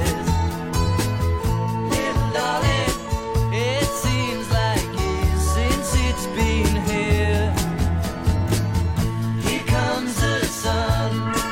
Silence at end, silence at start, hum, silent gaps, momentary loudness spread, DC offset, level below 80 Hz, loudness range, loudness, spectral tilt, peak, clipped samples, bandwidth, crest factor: 0 s; 0 s; none; none; 3 LU; under 0.1%; -28 dBFS; 1 LU; -22 LUFS; -5 dB/octave; -6 dBFS; under 0.1%; 16.5 kHz; 14 dB